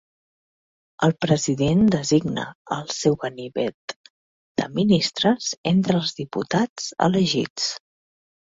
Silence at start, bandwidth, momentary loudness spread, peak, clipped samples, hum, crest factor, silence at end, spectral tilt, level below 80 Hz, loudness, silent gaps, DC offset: 1 s; 7.8 kHz; 11 LU; -2 dBFS; under 0.1%; none; 20 dB; 0.8 s; -5 dB/octave; -56 dBFS; -22 LUFS; 2.55-2.65 s, 3.74-3.88 s, 3.96-4.04 s, 4.10-4.55 s, 5.57-5.64 s, 6.69-6.76 s, 7.50-7.56 s; under 0.1%